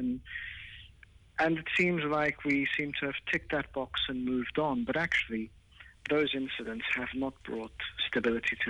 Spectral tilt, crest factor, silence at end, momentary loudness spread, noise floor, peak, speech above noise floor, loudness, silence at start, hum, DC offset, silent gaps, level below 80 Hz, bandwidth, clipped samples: -5.5 dB/octave; 14 dB; 0 s; 12 LU; -57 dBFS; -18 dBFS; 25 dB; -32 LUFS; 0 s; none; under 0.1%; none; -56 dBFS; 10.5 kHz; under 0.1%